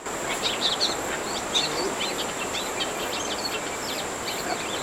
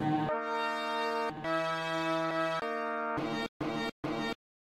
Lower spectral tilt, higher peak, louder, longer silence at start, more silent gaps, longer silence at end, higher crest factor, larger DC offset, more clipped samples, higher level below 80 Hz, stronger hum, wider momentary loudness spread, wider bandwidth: second, -1.5 dB/octave vs -5.5 dB/octave; first, -10 dBFS vs -18 dBFS; first, -26 LUFS vs -33 LUFS; about the same, 0 s vs 0 s; second, none vs 3.48-3.60 s, 3.92-4.03 s; second, 0 s vs 0.3 s; about the same, 18 dB vs 14 dB; neither; neither; first, -54 dBFS vs -64 dBFS; neither; about the same, 5 LU vs 4 LU; first, 19.5 kHz vs 15 kHz